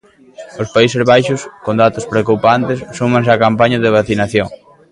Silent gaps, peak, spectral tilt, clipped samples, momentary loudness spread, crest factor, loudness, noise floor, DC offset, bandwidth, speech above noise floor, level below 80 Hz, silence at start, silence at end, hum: none; 0 dBFS; -6 dB/octave; under 0.1%; 9 LU; 14 dB; -13 LUFS; -36 dBFS; under 0.1%; 11.5 kHz; 23 dB; -46 dBFS; 0.4 s; 0.35 s; none